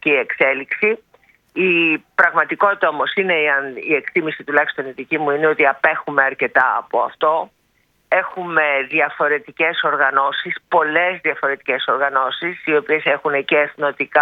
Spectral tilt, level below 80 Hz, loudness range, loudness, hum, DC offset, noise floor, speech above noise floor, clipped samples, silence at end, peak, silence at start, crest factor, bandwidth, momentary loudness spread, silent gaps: -6.5 dB/octave; -68 dBFS; 1 LU; -17 LUFS; none; under 0.1%; -62 dBFS; 44 dB; under 0.1%; 0 s; 0 dBFS; 0.05 s; 18 dB; 5.2 kHz; 6 LU; none